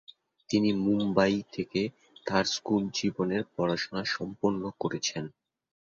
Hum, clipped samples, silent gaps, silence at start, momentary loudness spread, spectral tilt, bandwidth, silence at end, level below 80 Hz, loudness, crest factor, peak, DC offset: none; under 0.1%; none; 0.5 s; 7 LU; -5 dB/octave; 7.6 kHz; 0.55 s; -62 dBFS; -29 LUFS; 20 dB; -10 dBFS; under 0.1%